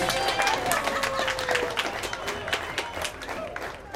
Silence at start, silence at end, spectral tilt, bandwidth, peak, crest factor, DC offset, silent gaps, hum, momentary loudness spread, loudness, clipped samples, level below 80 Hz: 0 s; 0 s; -2 dB/octave; 16.5 kHz; -4 dBFS; 26 dB; under 0.1%; none; none; 10 LU; -27 LUFS; under 0.1%; -50 dBFS